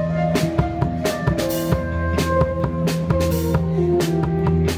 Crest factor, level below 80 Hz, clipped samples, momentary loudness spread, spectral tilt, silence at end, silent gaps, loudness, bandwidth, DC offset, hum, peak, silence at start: 14 dB; -34 dBFS; under 0.1%; 3 LU; -6.5 dB/octave; 0 s; none; -20 LUFS; 17.5 kHz; under 0.1%; none; -6 dBFS; 0 s